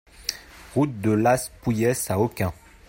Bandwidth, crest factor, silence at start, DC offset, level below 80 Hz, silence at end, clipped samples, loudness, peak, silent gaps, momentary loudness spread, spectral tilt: 16.5 kHz; 20 dB; 0.2 s; under 0.1%; -50 dBFS; 0.35 s; under 0.1%; -24 LUFS; -4 dBFS; none; 10 LU; -5.5 dB/octave